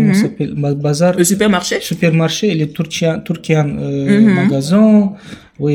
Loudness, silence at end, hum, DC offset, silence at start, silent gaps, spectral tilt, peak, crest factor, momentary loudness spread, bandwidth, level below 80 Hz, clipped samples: -14 LUFS; 0 s; none; under 0.1%; 0 s; none; -5.5 dB/octave; 0 dBFS; 14 dB; 8 LU; 16 kHz; -50 dBFS; under 0.1%